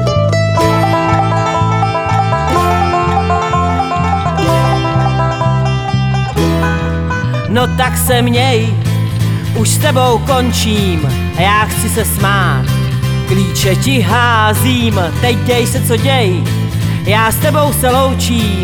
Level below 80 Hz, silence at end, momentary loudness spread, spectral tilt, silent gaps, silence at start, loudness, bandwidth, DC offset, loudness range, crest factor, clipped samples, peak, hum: -30 dBFS; 0 s; 4 LU; -5 dB/octave; none; 0 s; -12 LUFS; over 20 kHz; under 0.1%; 1 LU; 12 dB; under 0.1%; 0 dBFS; none